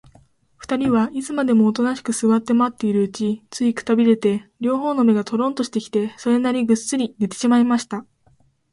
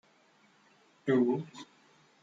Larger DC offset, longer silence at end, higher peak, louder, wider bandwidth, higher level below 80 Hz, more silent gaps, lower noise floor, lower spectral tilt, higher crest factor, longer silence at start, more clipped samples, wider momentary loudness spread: neither; about the same, 0.7 s vs 0.6 s; first, -4 dBFS vs -16 dBFS; first, -20 LUFS vs -31 LUFS; first, 11.5 kHz vs 7.6 kHz; first, -60 dBFS vs -84 dBFS; neither; second, -59 dBFS vs -66 dBFS; second, -5.5 dB/octave vs -7.5 dB/octave; about the same, 16 dB vs 18 dB; second, 0.6 s vs 1.05 s; neither; second, 7 LU vs 23 LU